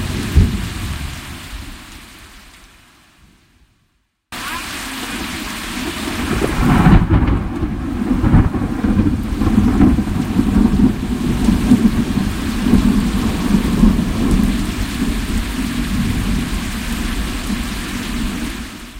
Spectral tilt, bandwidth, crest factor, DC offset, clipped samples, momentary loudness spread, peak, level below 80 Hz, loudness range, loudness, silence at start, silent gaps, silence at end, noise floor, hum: -6 dB/octave; 16 kHz; 16 dB; under 0.1%; under 0.1%; 12 LU; 0 dBFS; -22 dBFS; 14 LU; -17 LUFS; 0 s; none; 0 s; -64 dBFS; none